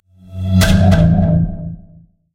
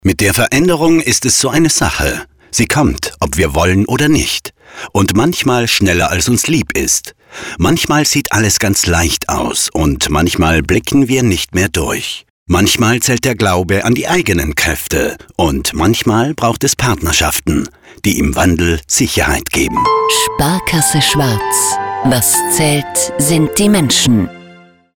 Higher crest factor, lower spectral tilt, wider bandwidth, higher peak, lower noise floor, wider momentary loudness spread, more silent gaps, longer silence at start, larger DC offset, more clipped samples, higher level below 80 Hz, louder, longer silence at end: about the same, 14 dB vs 10 dB; first, -6.5 dB/octave vs -3.5 dB/octave; second, 16 kHz vs over 20 kHz; about the same, 0 dBFS vs -2 dBFS; first, -45 dBFS vs -41 dBFS; first, 18 LU vs 6 LU; second, none vs 12.30-12.46 s; first, 0.3 s vs 0.05 s; neither; neither; about the same, -24 dBFS vs -28 dBFS; about the same, -13 LUFS vs -12 LUFS; first, 0.55 s vs 0.4 s